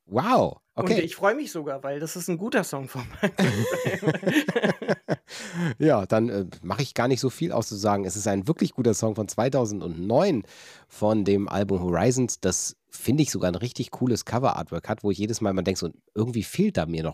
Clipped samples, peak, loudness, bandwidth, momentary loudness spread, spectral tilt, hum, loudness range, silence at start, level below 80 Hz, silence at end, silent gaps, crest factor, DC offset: under 0.1%; -8 dBFS; -26 LUFS; 16 kHz; 9 LU; -5.5 dB/octave; none; 2 LU; 0.1 s; -56 dBFS; 0 s; none; 18 dB; under 0.1%